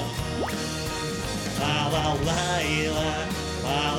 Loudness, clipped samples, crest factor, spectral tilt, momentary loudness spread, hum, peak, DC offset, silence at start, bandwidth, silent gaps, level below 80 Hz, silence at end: -26 LUFS; under 0.1%; 16 dB; -4 dB/octave; 5 LU; none; -12 dBFS; under 0.1%; 0 s; 18 kHz; none; -40 dBFS; 0 s